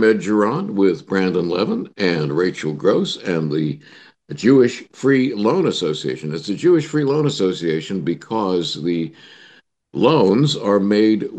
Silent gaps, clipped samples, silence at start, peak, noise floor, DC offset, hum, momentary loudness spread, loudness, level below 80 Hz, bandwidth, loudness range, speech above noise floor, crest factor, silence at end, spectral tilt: none; under 0.1%; 0 s; -2 dBFS; -51 dBFS; under 0.1%; none; 9 LU; -18 LUFS; -62 dBFS; 9 kHz; 3 LU; 33 dB; 16 dB; 0 s; -6.5 dB/octave